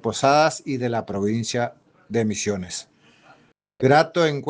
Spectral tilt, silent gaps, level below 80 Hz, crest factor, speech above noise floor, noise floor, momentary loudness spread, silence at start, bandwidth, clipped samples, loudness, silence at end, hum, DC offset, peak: -5 dB/octave; none; -62 dBFS; 20 dB; 35 dB; -56 dBFS; 11 LU; 0.05 s; 10 kHz; under 0.1%; -22 LUFS; 0 s; none; under 0.1%; -4 dBFS